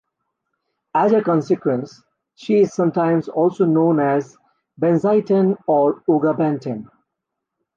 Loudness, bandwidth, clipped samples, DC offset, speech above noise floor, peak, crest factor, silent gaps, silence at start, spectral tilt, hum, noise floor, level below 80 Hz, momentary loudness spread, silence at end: -18 LUFS; 7.4 kHz; under 0.1%; under 0.1%; 63 dB; -6 dBFS; 14 dB; none; 0.95 s; -8.5 dB/octave; none; -80 dBFS; -68 dBFS; 9 LU; 0.9 s